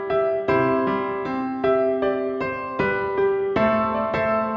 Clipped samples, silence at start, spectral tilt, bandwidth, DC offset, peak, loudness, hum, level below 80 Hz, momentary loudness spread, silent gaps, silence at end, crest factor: under 0.1%; 0 s; -8 dB/octave; 6 kHz; under 0.1%; -6 dBFS; -22 LUFS; none; -50 dBFS; 6 LU; none; 0 s; 14 dB